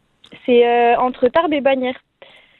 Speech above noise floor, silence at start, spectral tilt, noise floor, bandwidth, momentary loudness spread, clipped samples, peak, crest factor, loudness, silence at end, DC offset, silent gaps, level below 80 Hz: 32 dB; 0.35 s; -7 dB/octave; -47 dBFS; 4.3 kHz; 12 LU; under 0.1%; -4 dBFS; 14 dB; -16 LUFS; 0.65 s; under 0.1%; none; -54 dBFS